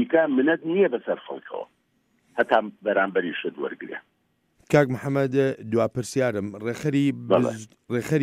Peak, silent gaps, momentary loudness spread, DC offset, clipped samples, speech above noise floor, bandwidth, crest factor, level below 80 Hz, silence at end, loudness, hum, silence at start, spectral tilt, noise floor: -6 dBFS; none; 14 LU; under 0.1%; under 0.1%; 46 dB; 15.5 kHz; 20 dB; -62 dBFS; 0 s; -24 LUFS; none; 0 s; -6.5 dB/octave; -69 dBFS